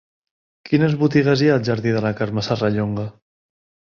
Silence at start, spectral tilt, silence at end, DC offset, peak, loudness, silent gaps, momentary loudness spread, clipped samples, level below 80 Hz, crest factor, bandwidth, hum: 0.65 s; -7.5 dB/octave; 0.75 s; under 0.1%; -2 dBFS; -19 LUFS; none; 8 LU; under 0.1%; -52 dBFS; 18 dB; 7.2 kHz; none